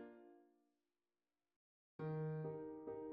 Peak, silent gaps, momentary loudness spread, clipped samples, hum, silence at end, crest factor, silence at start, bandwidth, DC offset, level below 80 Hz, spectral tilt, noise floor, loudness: -38 dBFS; 1.56-1.99 s; 20 LU; under 0.1%; none; 0 s; 14 dB; 0 s; 4.5 kHz; under 0.1%; -84 dBFS; -10 dB/octave; under -90 dBFS; -48 LUFS